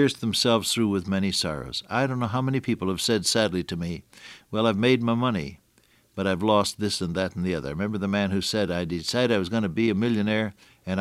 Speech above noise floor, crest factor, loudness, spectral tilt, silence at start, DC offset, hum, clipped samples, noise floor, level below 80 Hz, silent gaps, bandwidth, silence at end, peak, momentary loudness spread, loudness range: 37 dB; 18 dB; -25 LUFS; -4.5 dB/octave; 0 s; under 0.1%; none; under 0.1%; -62 dBFS; -54 dBFS; none; 15.5 kHz; 0 s; -6 dBFS; 10 LU; 2 LU